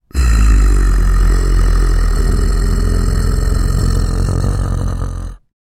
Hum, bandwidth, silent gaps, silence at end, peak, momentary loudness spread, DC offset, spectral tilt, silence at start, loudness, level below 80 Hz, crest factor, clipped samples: none; 13.5 kHz; none; 0.4 s; 0 dBFS; 7 LU; under 0.1%; -6 dB/octave; 0.15 s; -16 LUFS; -12 dBFS; 12 dB; under 0.1%